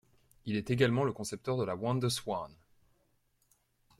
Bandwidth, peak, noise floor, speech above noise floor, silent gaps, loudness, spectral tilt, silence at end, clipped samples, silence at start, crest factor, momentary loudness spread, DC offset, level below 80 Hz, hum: 15.5 kHz; -14 dBFS; -74 dBFS; 41 dB; none; -33 LUFS; -5.5 dB/octave; 1.45 s; under 0.1%; 0.45 s; 22 dB; 10 LU; under 0.1%; -66 dBFS; none